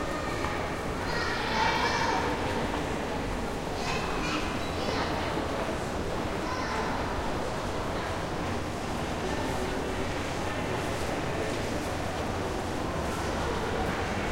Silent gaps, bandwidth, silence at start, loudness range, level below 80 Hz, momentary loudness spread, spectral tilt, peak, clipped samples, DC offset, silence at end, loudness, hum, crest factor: none; 16.5 kHz; 0 s; 3 LU; -42 dBFS; 5 LU; -4.5 dB/octave; -14 dBFS; under 0.1%; under 0.1%; 0 s; -31 LUFS; none; 16 dB